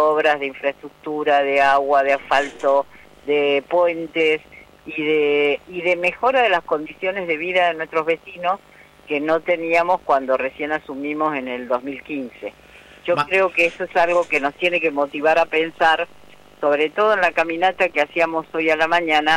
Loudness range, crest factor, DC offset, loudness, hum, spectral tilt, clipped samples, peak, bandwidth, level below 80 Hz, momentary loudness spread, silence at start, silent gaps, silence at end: 3 LU; 14 dB; under 0.1%; -19 LUFS; none; -4.5 dB/octave; under 0.1%; -6 dBFS; 13 kHz; -58 dBFS; 10 LU; 0 s; none; 0 s